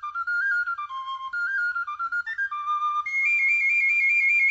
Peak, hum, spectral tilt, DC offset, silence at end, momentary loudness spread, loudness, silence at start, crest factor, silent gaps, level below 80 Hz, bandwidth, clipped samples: -14 dBFS; none; 2.5 dB/octave; under 0.1%; 0 s; 11 LU; -23 LUFS; 0 s; 10 dB; none; -72 dBFS; 8 kHz; under 0.1%